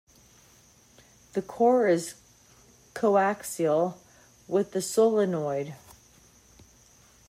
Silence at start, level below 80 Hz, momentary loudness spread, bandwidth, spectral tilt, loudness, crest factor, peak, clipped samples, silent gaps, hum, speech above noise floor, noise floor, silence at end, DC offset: 1.35 s; -68 dBFS; 13 LU; 16 kHz; -5.5 dB/octave; -26 LUFS; 18 dB; -10 dBFS; under 0.1%; none; none; 33 dB; -58 dBFS; 1.5 s; under 0.1%